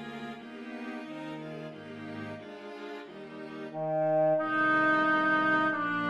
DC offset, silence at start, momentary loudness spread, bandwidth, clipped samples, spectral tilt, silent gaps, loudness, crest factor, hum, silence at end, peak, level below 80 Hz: under 0.1%; 0 s; 18 LU; 9.2 kHz; under 0.1%; -6.5 dB/octave; none; -28 LUFS; 16 dB; none; 0 s; -16 dBFS; -76 dBFS